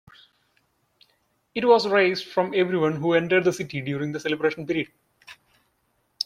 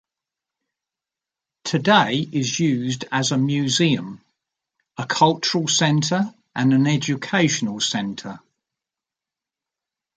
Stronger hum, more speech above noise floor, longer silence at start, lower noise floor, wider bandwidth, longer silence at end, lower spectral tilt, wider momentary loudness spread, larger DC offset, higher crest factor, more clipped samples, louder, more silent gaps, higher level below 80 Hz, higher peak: neither; second, 48 dB vs 68 dB; about the same, 1.55 s vs 1.65 s; second, -70 dBFS vs -88 dBFS; first, 14 kHz vs 9.4 kHz; second, 0 s vs 1.8 s; first, -5.5 dB/octave vs -4 dB/octave; about the same, 10 LU vs 12 LU; neither; about the same, 20 dB vs 22 dB; neither; second, -23 LUFS vs -20 LUFS; neither; about the same, -66 dBFS vs -64 dBFS; second, -6 dBFS vs -2 dBFS